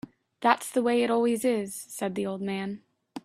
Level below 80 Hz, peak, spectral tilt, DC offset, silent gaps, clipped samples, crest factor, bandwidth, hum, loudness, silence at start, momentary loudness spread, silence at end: -72 dBFS; -4 dBFS; -4.5 dB/octave; under 0.1%; none; under 0.1%; 24 dB; 16 kHz; none; -27 LUFS; 0.05 s; 14 LU; 0.05 s